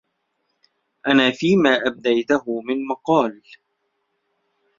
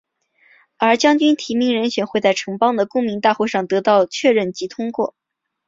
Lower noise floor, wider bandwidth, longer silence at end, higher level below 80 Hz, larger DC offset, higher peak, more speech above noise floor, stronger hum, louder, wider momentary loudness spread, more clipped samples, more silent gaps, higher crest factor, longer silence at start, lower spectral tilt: first, -73 dBFS vs -57 dBFS; about the same, 7.6 kHz vs 7.8 kHz; first, 1.45 s vs 0.6 s; about the same, -64 dBFS vs -64 dBFS; neither; about the same, -2 dBFS vs -2 dBFS; first, 54 dB vs 40 dB; neither; about the same, -19 LUFS vs -18 LUFS; about the same, 9 LU vs 9 LU; neither; neither; about the same, 20 dB vs 16 dB; first, 1.05 s vs 0.8 s; about the same, -5.5 dB/octave vs -4.5 dB/octave